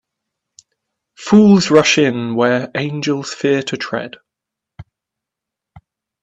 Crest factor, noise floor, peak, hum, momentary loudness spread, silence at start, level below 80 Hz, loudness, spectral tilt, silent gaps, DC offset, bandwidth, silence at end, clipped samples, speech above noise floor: 18 dB; -83 dBFS; 0 dBFS; none; 14 LU; 1.2 s; -58 dBFS; -14 LUFS; -5 dB/octave; none; under 0.1%; 8 kHz; 1.4 s; under 0.1%; 69 dB